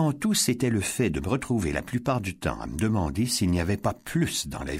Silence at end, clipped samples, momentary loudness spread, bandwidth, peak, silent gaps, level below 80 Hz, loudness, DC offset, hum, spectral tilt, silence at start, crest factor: 0 s; under 0.1%; 5 LU; 16 kHz; -12 dBFS; none; -42 dBFS; -26 LUFS; under 0.1%; none; -4.5 dB/octave; 0 s; 16 dB